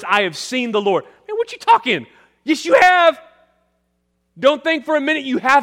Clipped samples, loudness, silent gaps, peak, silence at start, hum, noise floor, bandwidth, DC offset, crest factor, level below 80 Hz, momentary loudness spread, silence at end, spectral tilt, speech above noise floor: under 0.1%; -16 LUFS; none; -2 dBFS; 0 s; none; -68 dBFS; 16 kHz; under 0.1%; 16 dB; -64 dBFS; 12 LU; 0 s; -3.5 dB/octave; 52 dB